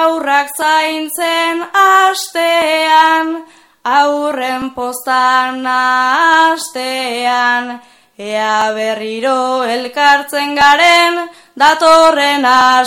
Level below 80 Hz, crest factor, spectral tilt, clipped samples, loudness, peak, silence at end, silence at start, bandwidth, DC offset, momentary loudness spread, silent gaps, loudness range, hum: -56 dBFS; 12 dB; -1 dB/octave; 0.2%; -11 LUFS; 0 dBFS; 0 s; 0 s; 17.5 kHz; under 0.1%; 11 LU; none; 5 LU; none